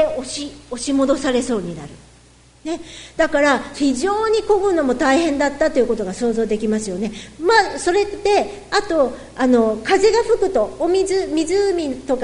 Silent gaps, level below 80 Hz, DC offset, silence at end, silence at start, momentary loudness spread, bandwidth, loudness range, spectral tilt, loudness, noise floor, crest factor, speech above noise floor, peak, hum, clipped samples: none; -44 dBFS; under 0.1%; 0 s; 0 s; 12 LU; 11 kHz; 3 LU; -4 dB/octave; -18 LUFS; -49 dBFS; 18 dB; 31 dB; 0 dBFS; none; under 0.1%